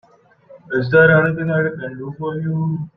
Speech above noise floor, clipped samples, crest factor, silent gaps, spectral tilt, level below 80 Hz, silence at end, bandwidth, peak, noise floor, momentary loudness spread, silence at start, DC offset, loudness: 32 dB; under 0.1%; 16 dB; none; -10 dB/octave; -52 dBFS; 0.1 s; 4.9 kHz; -2 dBFS; -49 dBFS; 15 LU; 0.5 s; under 0.1%; -17 LUFS